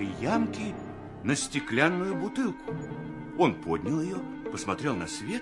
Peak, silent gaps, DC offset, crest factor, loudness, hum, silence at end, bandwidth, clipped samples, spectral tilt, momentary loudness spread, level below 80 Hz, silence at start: -6 dBFS; none; under 0.1%; 24 dB; -30 LUFS; none; 0 s; 11.5 kHz; under 0.1%; -5 dB/octave; 11 LU; -58 dBFS; 0 s